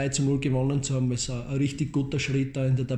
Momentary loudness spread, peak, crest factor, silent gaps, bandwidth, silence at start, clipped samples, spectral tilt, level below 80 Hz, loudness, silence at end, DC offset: 3 LU; -12 dBFS; 14 dB; none; 10.5 kHz; 0 s; under 0.1%; -5.5 dB/octave; -46 dBFS; -27 LUFS; 0 s; under 0.1%